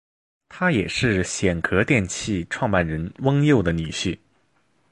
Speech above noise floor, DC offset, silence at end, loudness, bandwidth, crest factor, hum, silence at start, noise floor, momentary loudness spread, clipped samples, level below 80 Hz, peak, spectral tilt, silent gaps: 44 dB; under 0.1%; 0.75 s; -22 LUFS; 11.5 kHz; 20 dB; none; 0.5 s; -66 dBFS; 8 LU; under 0.1%; -40 dBFS; -2 dBFS; -5.5 dB/octave; none